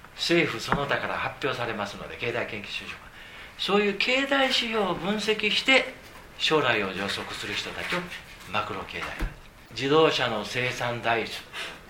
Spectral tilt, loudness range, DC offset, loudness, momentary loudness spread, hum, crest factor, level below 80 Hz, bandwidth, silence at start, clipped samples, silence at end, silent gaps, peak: -4 dB/octave; 6 LU; under 0.1%; -26 LUFS; 14 LU; none; 24 dB; -48 dBFS; 16 kHz; 0 s; under 0.1%; 0 s; none; -4 dBFS